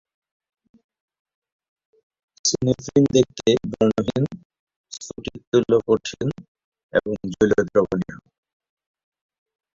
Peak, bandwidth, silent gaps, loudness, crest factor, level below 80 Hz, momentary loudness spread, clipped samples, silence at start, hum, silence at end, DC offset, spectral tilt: -4 dBFS; 7.8 kHz; 4.45-4.50 s, 4.59-4.67 s, 4.76-4.84 s, 5.47-5.52 s, 6.48-6.55 s, 6.64-6.72 s, 6.83-6.89 s; -21 LUFS; 20 dB; -52 dBFS; 16 LU; under 0.1%; 2.45 s; none; 1.55 s; under 0.1%; -5 dB/octave